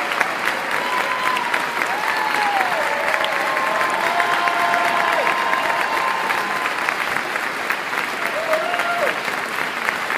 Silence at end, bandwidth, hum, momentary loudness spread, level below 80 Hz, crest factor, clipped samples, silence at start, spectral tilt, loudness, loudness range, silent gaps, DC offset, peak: 0 s; 16 kHz; none; 4 LU; -64 dBFS; 20 dB; under 0.1%; 0 s; -2 dB/octave; -19 LUFS; 3 LU; none; under 0.1%; -2 dBFS